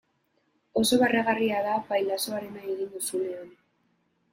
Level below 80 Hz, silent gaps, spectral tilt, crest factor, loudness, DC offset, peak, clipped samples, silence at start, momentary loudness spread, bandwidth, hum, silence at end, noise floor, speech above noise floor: -66 dBFS; none; -3.5 dB/octave; 18 dB; -27 LUFS; under 0.1%; -10 dBFS; under 0.1%; 0.75 s; 12 LU; 16.5 kHz; none; 0.8 s; -72 dBFS; 45 dB